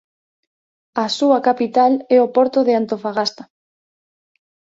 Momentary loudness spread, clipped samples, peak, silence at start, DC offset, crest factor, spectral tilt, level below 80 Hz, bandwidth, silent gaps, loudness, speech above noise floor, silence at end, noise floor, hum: 8 LU; under 0.1%; -2 dBFS; 0.95 s; under 0.1%; 16 dB; -4.5 dB/octave; -68 dBFS; 7.8 kHz; none; -17 LUFS; over 74 dB; 1.35 s; under -90 dBFS; none